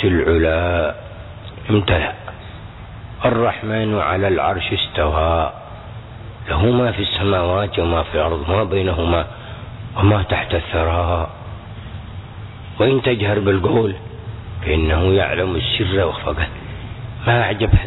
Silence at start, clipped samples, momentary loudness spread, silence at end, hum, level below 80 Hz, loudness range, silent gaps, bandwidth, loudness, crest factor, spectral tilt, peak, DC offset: 0 s; under 0.1%; 18 LU; 0 s; none; -30 dBFS; 2 LU; none; 4.1 kHz; -18 LUFS; 16 dB; -9.5 dB/octave; -2 dBFS; under 0.1%